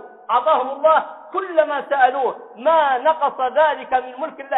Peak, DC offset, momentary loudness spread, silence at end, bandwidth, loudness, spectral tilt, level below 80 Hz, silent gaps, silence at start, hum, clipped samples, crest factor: -2 dBFS; under 0.1%; 8 LU; 0 s; 4 kHz; -19 LUFS; -6.5 dB/octave; -66 dBFS; none; 0 s; none; under 0.1%; 16 dB